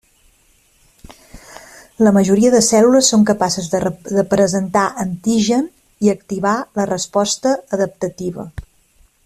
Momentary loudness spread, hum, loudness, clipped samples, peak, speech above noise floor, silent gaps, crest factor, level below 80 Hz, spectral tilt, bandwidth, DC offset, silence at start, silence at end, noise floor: 12 LU; none; -16 LUFS; under 0.1%; 0 dBFS; 40 dB; none; 16 dB; -48 dBFS; -4.5 dB/octave; 14 kHz; under 0.1%; 1.35 s; 0.65 s; -55 dBFS